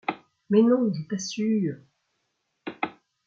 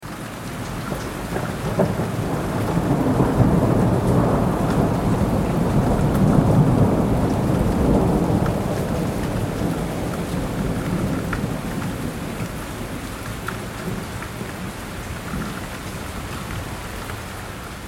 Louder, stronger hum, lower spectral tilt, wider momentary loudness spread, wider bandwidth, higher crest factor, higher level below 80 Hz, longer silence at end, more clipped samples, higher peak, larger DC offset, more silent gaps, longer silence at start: second, -25 LUFS vs -22 LUFS; neither; about the same, -6 dB/octave vs -7 dB/octave; first, 21 LU vs 13 LU; second, 7.6 kHz vs 17 kHz; about the same, 18 dB vs 20 dB; second, -72 dBFS vs -32 dBFS; first, 0.35 s vs 0 s; neither; second, -8 dBFS vs -2 dBFS; neither; neither; about the same, 0.1 s vs 0 s